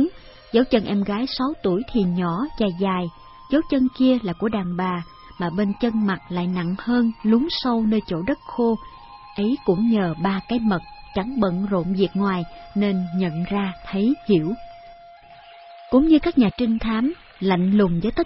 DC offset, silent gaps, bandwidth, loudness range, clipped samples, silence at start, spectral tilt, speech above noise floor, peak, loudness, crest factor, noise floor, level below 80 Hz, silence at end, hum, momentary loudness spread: under 0.1%; none; 5.8 kHz; 2 LU; under 0.1%; 0 s; -11 dB/octave; 25 dB; -4 dBFS; -22 LUFS; 18 dB; -45 dBFS; -44 dBFS; 0 s; none; 8 LU